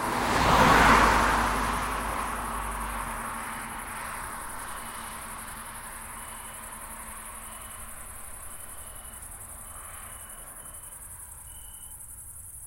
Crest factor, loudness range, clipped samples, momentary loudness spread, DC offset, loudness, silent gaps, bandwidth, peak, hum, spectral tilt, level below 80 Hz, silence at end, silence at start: 24 dB; 17 LU; under 0.1%; 20 LU; under 0.1%; -27 LUFS; none; 16.5 kHz; -6 dBFS; none; -3.5 dB/octave; -40 dBFS; 0 s; 0 s